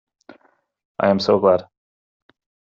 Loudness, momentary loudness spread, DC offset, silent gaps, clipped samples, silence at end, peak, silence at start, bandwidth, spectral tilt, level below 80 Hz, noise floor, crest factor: -18 LUFS; 7 LU; under 0.1%; none; under 0.1%; 1.1 s; -4 dBFS; 1 s; 7.6 kHz; -4.5 dB/octave; -64 dBFS; -59 dBFS; 20 dB